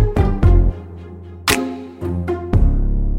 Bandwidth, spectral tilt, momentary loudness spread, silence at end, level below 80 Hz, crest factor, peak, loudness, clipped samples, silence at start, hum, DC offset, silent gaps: 16 kHz; -5.5 dB/octave; 19 LU; 0 s; -18 dBFS; 16 dB; 0 dBFS; -19 LUFS; under 0.1%; 0 s; none; under 0.1%; none